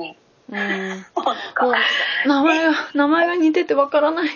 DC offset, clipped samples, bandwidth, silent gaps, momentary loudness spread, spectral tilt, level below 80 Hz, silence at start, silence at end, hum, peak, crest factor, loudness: under 0.1%; under 0.1%; 7.2 kHz; none; 9 LU; -4.5 dB/octave; -70 dBFS; 0 s; 0 s; none; -4 dBFS; 16 dB; -18 LUFS